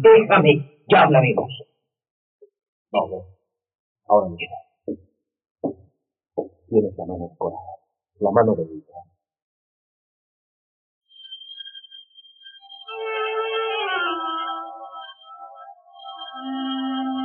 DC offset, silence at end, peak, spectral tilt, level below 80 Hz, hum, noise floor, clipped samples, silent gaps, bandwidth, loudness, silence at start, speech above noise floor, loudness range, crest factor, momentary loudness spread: under 0.1%; 0 s; -4 dBFS; -4 dB/octave; -68 dBFS; none; -58 dBFS; under 0.1%; 2.10-2.39 s, 2.68-2.85 s, 3.75-3.96 s, 5.51-5.55 s, 9.42-11.01 s; 4.3 kHz; -21 LUFS; 0 s; 39 dB; 18 LU; 20 dB; 24 LU